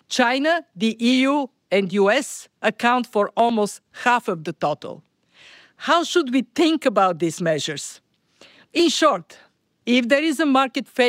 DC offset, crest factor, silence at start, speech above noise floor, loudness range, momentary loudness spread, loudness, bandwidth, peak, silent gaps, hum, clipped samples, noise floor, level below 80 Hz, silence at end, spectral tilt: under 0.1%; 16 dB; 0.1 s; 33 dB; 2 LU; 9 LU; -20 LUFS; 16 kHz; -6 dBFS; none; none; under 0.1%; -53 dBFS; -74 dBFS; 0 s; -4 dB/octave